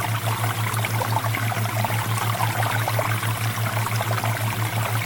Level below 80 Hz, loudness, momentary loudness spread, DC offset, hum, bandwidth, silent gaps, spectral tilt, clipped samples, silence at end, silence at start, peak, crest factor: -54 dBFS; -23 LUFS; 2 LU; under 0.1%; none; 19 kHz; none; -4.5 dB/octave; under 0.1%; 0 s; 0 s; -8 dBFS; 16 dB